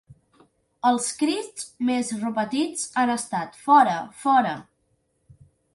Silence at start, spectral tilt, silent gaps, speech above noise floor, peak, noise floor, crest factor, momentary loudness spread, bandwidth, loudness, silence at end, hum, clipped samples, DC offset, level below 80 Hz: 0.1 s; -3.5 dB/octave; none; 47 dB; -4 dBFS; -70 dBFS; 20 dB; 12 LU; 11.5 kHz; -23 LUFS; 1.15 s; none; under 0.1%; under 0.1%; -68 dBFS